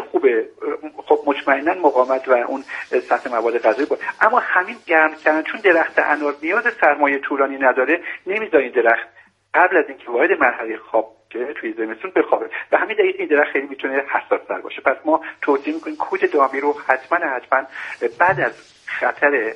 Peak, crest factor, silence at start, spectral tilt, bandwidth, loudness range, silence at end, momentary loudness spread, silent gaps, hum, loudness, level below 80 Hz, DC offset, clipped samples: 0 dBFS; 18 dB; 0 s; -5.5 dB/octave; 9.2 kHz; 3 LU; 0 s; 10 LU; none; none; -19 LUFS; -66 dBFS; under 0.1%; under 0.1%